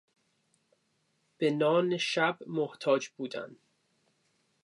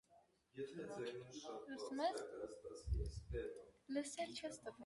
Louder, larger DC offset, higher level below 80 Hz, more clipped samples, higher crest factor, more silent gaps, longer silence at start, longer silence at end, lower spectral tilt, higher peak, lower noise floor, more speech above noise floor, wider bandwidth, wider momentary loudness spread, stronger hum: first, -30 LUFS vs -48 LUFS; neither; second, -86 dBFS vs -54 dBFS; neither; about the same, 20 dB vs 18 dB; neither; first, 1.4 s vs 0.1 s; first, 1.1 s vs 0 s; about the same, -5 dB/octave vs -5 dB/octave; first, -14 dBFS vs -30 dBFS; about the same, -75 dBFS vs -74 dBFS; first, 45 dB vs 27 dB; about the same, 11.5 kHz vs 11.5 kHz; about the same, 12 LU vs 10 LU; neither